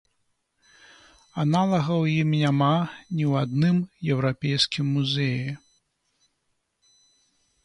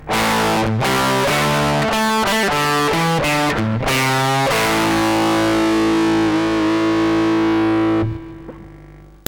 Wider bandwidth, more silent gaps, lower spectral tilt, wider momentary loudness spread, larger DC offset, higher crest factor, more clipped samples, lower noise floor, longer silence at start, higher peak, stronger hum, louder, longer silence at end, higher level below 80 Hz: second, 11 kHz vs over 20 kHz; neither; first, -6.5 dB/octave vs -4.5 dB/octave; first, 7 LU vs 2 LU; neither; about the same, 20 dB vs 16 dB; neither; first, -75 dBFS vs -41 dBFS; first, 1.35 s vs 0 s; second, -6 dBFS vs 0 dBFS; neither; second, -24 LUFS vs -16 LUFS; first, 2.1 s vs 0.2 s; second, -62 dBFS vs -40 dBFS